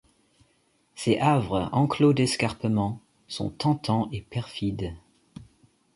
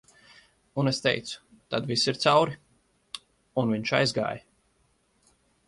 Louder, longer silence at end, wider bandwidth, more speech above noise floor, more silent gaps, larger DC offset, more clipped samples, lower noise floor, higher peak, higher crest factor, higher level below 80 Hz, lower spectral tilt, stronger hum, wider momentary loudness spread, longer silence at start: about the same, -26 LUFS vs -26 LUFS; second, 0.5 s vs 1.3 s; about the same, 11.5 kHz vs 11.5 kHz; about the same, 42 dB vs 43 dB; neither; neither; neither; about the same, -67 dBFS vs -68 dBFS; about the same, -8 dBFS vs -8 dBFS; about the same, 18 dB vs 22 dB; first, -52 dBFS vs -64 dBFS; first, -6 dB/octave vs -4.5 dB/octave; neither; second, 13 LU vs 20 LU; first, 0.95 s vs 0.75 s